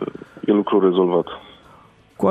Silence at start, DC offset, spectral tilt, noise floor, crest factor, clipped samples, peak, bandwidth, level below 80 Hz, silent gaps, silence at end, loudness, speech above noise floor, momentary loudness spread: 0 s; under 0.1%; -8.5 dB/octave; -50 dBFS; 16 dB; under 0.1%; -6 dBFS; 8.2 kHz; -60 dBFS; none; 0 s; -19 LUFS; 32 dB; 15 LU